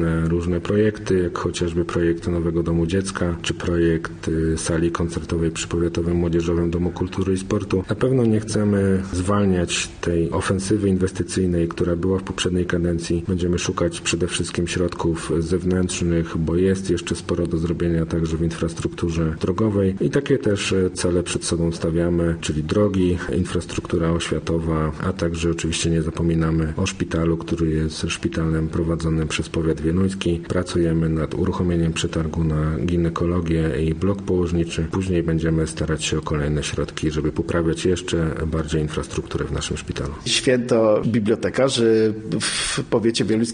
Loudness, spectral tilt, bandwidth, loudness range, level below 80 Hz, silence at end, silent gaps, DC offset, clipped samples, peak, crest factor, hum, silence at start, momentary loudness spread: -22 LUFS; -5.5 dB/octave; 10 kHz; 2 LU; -36 dBFS; 0 s; none; under 0.1%; under 0.1%; -4 dBFS; 16 dB; none; 0 s; 4 LU